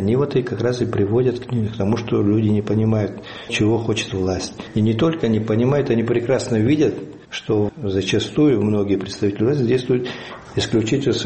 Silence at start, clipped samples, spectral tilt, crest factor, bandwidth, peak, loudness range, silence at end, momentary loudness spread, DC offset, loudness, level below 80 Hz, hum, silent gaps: 0 s; under 0.1%; -6.5 dB/octave; 14 dB; 8.8 kHz; -4 dBFS; 1 LU; 0 s; 7 LU; 0.1%; -20 LUFS; -48 dBFS; none; none